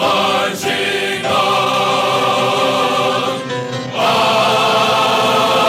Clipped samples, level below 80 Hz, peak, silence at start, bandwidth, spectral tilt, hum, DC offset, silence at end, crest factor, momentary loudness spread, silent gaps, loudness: under 0.1%; -62 dBFS; -2 dBFS; 0 s; 16.5 kHz; -3.5 dB/octave; none; under 0.1%; 0 s; 12 dB; 5 LU; none; -14 LUFS